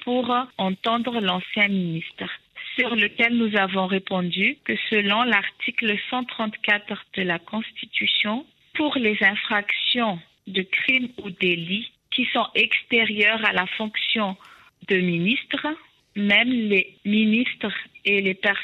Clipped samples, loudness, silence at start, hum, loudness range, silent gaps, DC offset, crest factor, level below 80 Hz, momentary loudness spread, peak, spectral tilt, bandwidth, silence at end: under 0.1%; -22 LUFS; 0 s; none; 2 LU; none; under 0.1%; 18 dB; -68 dBFS; 10 LU; -6 dBFS; -6.5 dB/octave; 7 kHz; 0 s